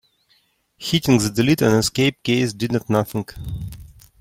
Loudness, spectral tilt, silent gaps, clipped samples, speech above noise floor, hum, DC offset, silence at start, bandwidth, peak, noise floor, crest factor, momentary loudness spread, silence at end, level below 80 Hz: -19 LUFS; -5 dB/octave; none; under 0.1%; 43 dB; none; under 0.1%; 0.8 s; 16.5 kHz; -4 dBFS; -62 dBFS; 18 dB; 14 LU; 0.35 s; -44 dBFS